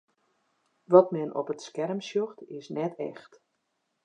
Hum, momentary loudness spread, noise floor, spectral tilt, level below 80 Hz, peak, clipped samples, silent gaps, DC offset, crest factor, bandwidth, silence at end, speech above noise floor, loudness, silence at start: none; 17 LU; -78 dBFS; -7 dB/octave; -86 dBFS; -4 dBFS; under 0.1%; none; under 0.1%; 24 dB; 9 kHz; 0.85 s; 51 dB; -28 LUFS; 0.9 s